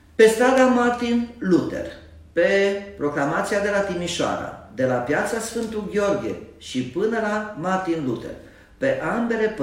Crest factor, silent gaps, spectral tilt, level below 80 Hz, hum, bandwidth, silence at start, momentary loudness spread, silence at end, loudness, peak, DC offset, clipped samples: 20 dB; none; -5 dB/octave; -50 dBFS; none; 16 kHz; 0.2 s; 13 LU; 0 s; -22 LUFS; -2 dBFS; under 0.1%; under 0.1%